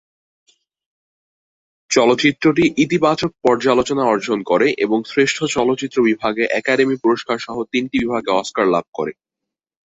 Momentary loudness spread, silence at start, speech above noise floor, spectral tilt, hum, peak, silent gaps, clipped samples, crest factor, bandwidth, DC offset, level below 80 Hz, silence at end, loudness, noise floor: 6 LU; 1.9 s; 67 dB; -4.5 dB/octave; none; 0 dBFS; 8.88-8.93 s; under 0.1%; 18 dB; 8.2 kHz; under 0.1%; -54 dBFS; 0.85 s; -17 LUFS; -84 dBFS